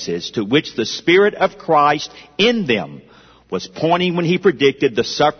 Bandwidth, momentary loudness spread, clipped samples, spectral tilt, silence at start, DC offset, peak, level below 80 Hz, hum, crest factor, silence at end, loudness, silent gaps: 6.6 kHz; 11 LU; under 0.1%; -5 dB/octave; 0 s; under 0.1%; -2 dBFS; -56 dBFS; none; 16 dB; 0.05 s; -17 LUFS; none